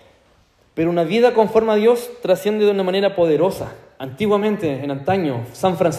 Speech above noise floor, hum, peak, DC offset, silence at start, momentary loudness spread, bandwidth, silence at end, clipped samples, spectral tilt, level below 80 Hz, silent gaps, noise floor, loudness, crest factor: 39 dB; none; -2 dBFS; under 0.1%; 0.75 s; 9 LU; 15 kHz; 0 s; under 0.1%; -6.5 dB/octave; -54 dBFS; none; -56 dBFS; -18 LUFS; 16 dB